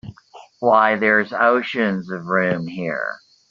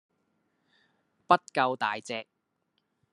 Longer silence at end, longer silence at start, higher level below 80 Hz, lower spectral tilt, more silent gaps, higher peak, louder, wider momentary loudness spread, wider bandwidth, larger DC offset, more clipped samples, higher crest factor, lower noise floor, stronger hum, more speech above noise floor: second, 0.35 s vs 0.9 s; second, 0.05 s vs 1.3 s; first, -62 dBFS vs -78 dBFS; about the same, -4 dB/octave vs -4.5 dB/octave; neither; first, -2 dBFS vs -6 dBFS; first, -19 LUFS vs -28 LUFS; about the same, 11 LU vs 13 LU; second, 7.4 kHz vs 11.5 kHz; neither; neither; second, 18 dB vs 26 dB; second, -45 dBFS vs -78 dBFS; neither; second, 27 dB vs 50 dB